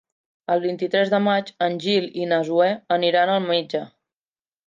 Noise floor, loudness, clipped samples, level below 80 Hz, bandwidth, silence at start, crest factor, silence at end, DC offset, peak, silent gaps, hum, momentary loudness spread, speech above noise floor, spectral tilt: under -90 dBFS; -21 LUFS; under 0.1%; -76 dBFS; 7.6 kHz; 0.5 s; 16 dB; 0.8 s; under 0.1%; -6 dBFS; none; none; 7 LU; over 69 dB; -6 dB/octave